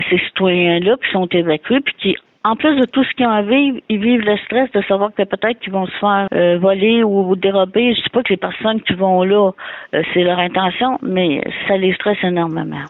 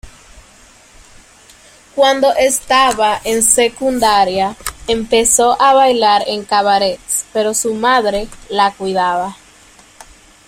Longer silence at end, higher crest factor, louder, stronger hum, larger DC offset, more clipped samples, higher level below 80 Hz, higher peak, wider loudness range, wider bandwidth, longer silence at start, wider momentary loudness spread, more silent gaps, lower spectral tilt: second, 0 s vs 1.15 s; about the same, 12 dB vs 14 dB; about the same, -15 LUFS vs -13 LUFS; neither; neither; neither; second, -54 dBFS vs -42 dBFS; second, -4 dBFS vs 0 dBFS; second, 1 LU vs 4 LU; second, 4.1 kHz vs 16.5 kHz; about the same, 0 s vs 0.05 s; second, 5 LU vs 9 LU; neither; first, -9 dB/octave vs -1.5 dB/octave